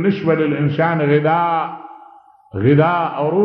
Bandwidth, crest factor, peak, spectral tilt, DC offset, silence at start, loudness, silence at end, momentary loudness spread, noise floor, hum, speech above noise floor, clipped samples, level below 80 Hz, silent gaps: 5.6 kHz; 14 dB; -2 dBFS; -10.5 dB/octave; under 0.1%; 0 s; -16 LUFS; 0 s; 10 LU; -45 dBFS; none; 29 dB; under 0.1%; -56 dBFS; none